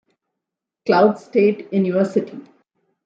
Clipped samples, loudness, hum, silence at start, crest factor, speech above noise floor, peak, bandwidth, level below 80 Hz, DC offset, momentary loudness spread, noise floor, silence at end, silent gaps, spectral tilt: under 0.1%; -18 LUFS; none; 0.85 s; 18 dB; 66 dB; -2 dBFS; 7.8 kHz; -68 dBFS; under 0.1%; 10 LU; -83 dBFS; 0.65 s; none; -8 dB/octave